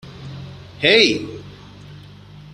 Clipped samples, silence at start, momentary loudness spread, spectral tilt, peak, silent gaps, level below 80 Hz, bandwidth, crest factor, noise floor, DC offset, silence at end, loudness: under 0.1%; 0.05 s; 24 LU; -3.5 dB/octave; 0 dBFS; none; -52 dBFS; 10.5 kHz; 22 dB; -41 dBFS; under 0.1%; 0.55 s; -15 LUFS